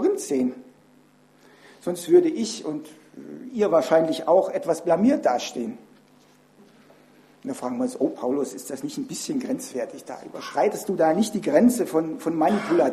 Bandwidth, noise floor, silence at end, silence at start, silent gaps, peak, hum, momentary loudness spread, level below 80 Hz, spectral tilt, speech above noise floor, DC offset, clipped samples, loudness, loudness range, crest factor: 14 kHz; -56 dBFS; 0 s; 0 s; none; -6 dBFS; none; 16 LU; -68 dBFS; -5 dB/octave; 33 dB; under 0.1%; under 0.1%; -24 LUFS; 7 LU; 18 dB